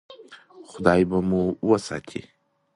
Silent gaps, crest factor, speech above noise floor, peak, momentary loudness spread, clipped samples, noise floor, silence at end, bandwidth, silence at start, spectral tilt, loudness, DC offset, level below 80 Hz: none; 20 dB; 24 dB; -4 dBFS; 18 LU; under 0.1%; -47 dBFS; 0.55 s; 11.5 kHz; 0.1 s; -7 dB/octave; -23 LUFS; under 0.1%; -50 dBFS